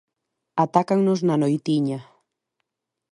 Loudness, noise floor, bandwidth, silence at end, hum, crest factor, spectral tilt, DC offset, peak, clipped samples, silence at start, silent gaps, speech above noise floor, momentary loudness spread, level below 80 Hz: -22 LUFS; -80 dBFS; 11 kHz; 1.1 s; none; 20 dB; -7.5 dB/octave; under 0.1%; -2 dBFS; under 0.1%; 0.55 s; none; 60 dB; 9 LU; -70 dBFS